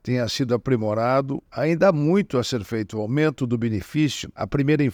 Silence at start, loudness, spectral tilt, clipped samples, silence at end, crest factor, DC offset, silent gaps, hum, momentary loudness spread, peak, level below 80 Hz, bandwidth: 0.05 s; -23 LUFS; -6.5 dB/octave; under 0.1%; 0 s; 18 dB; under 0.1%; none; none; 8 LU; -4 dBFS; -52 dBFS; over 20 kHz